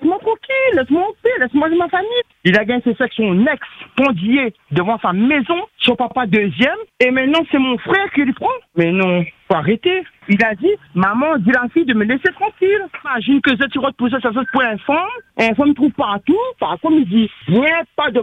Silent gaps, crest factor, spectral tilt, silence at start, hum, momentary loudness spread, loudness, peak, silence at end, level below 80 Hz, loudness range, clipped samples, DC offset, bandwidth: none; 16 dB; -7.5 dB/octave; 0 s; none; 5 LU; -16 LUFS; 0 dBFS; 0 s; -54 dBFS; 1 LU; under 0.1%; under 0.1%; 8 kHz